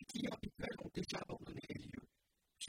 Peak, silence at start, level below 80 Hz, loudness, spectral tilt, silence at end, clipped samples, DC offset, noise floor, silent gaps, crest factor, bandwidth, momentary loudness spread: -30 dBFS; 0 s; -66 dBFS; -47 LUFS; -4.5 dB/octave; 0 s; under 0.1%; under 0.1%; -83 dBFS; none; 18 dB; 16 kHz; 6 LU